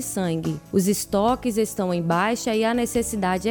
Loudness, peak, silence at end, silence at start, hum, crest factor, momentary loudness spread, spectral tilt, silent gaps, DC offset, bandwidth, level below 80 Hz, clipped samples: -23 LUFS; -8 dBFS; 0 s; 0 s; none; 14 dB; 3 LU; -5 dB/octave; none; under 0.1%; 19.5 kHz; -48 dBFS; under 0.1%